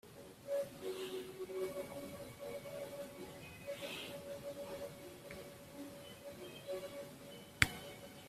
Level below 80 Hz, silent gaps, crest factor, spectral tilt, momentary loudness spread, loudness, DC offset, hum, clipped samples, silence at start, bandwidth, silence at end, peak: -64 dBFS; none; 38 dB; -3.5 dB/octave; 11 LU; -45 LUFS; under 0.1%; none; under 0.1%; 0.05 s; 16 kHz; 0 s; -8 dBFS